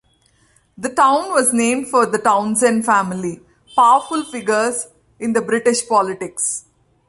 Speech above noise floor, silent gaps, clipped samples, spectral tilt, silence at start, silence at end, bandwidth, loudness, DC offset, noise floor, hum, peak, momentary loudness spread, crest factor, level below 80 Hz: 41 dB; none; under 0.1%; -3.5 dB/octave; 0.8 s; 0.5 s; 12 kHz; -17 LUFS; under 0.1%; -58 dBFS; none; -2 dBFS; 12 LU; 16 dB; -60 dBFS